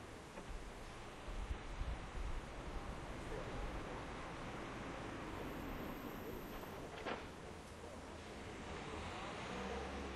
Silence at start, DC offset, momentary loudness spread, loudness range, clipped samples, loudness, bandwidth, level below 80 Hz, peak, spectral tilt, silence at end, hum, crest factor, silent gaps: 0 s; under 0.1%; 6 LU; 2 LU; under 0.1%; -49 LUFS; 12.5 kHz; -52 dBFS; -32 dBFS; -5 dB/octave; 0 s; none; 16 dB; none